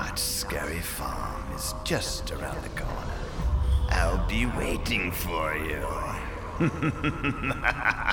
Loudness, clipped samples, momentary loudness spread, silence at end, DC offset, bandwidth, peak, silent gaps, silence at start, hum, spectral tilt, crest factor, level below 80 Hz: -29 LUFS; under 0.1%; 8 LU; 0 s; under 0.1%; 19.5 kHz; -8 dBFS; none; 0 s; none; -4.5 dB/octave; 20 dB; -32 dBFS